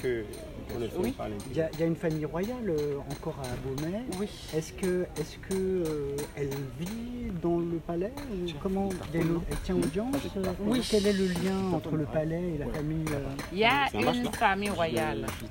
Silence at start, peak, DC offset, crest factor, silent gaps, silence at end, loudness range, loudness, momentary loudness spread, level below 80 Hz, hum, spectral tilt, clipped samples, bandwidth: 0 s; -10 dBFS; under 0.1%; 20 dB; none; 0 s; 4 LU; -31 LUFS; 9 LU; -46 dBFS; none; -5.5 dB/octave; under 0.1%; 16.5 kHz